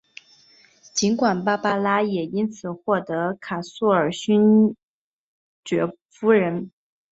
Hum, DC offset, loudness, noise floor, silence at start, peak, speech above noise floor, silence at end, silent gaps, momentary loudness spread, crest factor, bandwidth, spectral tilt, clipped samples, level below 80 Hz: none; under 0.1%; -22 LUFS; -55 dBFS; 0.95 s; -4 dBFS; 34 dB; 0.45 s; 4.83-5.63 s, 6.02-6.09 s; 12 LU; 18 dB; 8 kHz; -5.5 dB/octave; under 0.1%; -64 dBFS